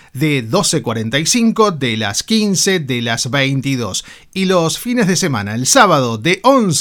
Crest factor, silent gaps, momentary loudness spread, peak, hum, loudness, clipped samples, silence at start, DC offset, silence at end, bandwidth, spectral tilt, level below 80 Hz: 14 dB; none; 6 LU; 0 dBFS; none; -14 LUFS; under 0.1%; 0.15 s; under 0.1%; 0 s; 19 kHz; -4 dB/octave; -50 dBFS